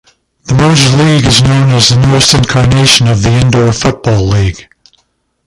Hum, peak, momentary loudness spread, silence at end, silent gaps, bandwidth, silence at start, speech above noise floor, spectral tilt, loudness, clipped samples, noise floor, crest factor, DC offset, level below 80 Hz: none; 0 dBFS; 6 LU; 0.85 s; none; 16 kHz; 0.45 s; 51 dB; -4.5 dB/octave; -7 LUFS; 0.3%; -58 dBFS; 8 dB; under 0.1%; -26 dBFS